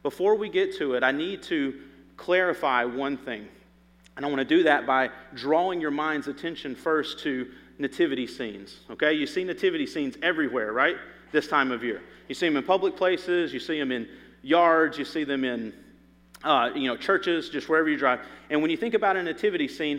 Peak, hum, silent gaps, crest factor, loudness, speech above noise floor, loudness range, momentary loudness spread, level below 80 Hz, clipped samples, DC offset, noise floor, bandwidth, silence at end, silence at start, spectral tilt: -6 dBFS; none; none; 20 dB; -26 LUFS; 31 dB; 3 LU; 11 LU; -64 dBFS; under 0.1%; under 0.1%; -57 dBFS; 14.5 kHz; 0 s; 0.05 s; -5 dB/octave